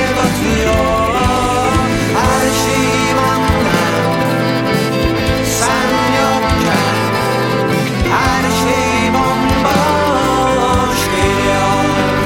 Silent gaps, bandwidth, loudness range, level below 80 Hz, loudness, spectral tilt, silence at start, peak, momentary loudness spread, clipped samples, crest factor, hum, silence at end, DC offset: none; 17 kHz; 1 LU; -28 dBFS; -13 LUFS; -4.5 dB/octave; 0 s; 0 dBFS; 2 LU; under 0.1%; 12 dB; none; 0 s; under 0.1%